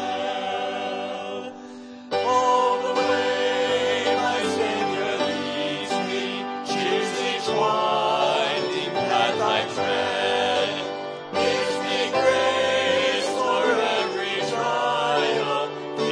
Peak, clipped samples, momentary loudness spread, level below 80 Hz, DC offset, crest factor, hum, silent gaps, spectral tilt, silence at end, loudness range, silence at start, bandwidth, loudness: -6 dBFS; under 0.1%; 8 LU; -68 dBFS; under 0.1%; 16 dB; none; none; -3 dB/octave; 0 s; 3 LU; 0 s; 10.5 kHz; -23 LUFS